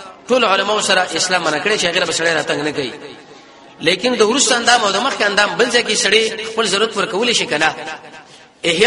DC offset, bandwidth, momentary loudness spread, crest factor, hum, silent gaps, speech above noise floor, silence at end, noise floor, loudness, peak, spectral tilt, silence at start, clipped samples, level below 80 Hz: under 0.1%; 11.5 kHz; 9 LU; 16 dB; none; none; 25 dB; 0 s; -41 dBFS; -15 LUFS; 0 dBFS; -1.5 dB/octave; 0 s; under 0.1%; -56 dBFS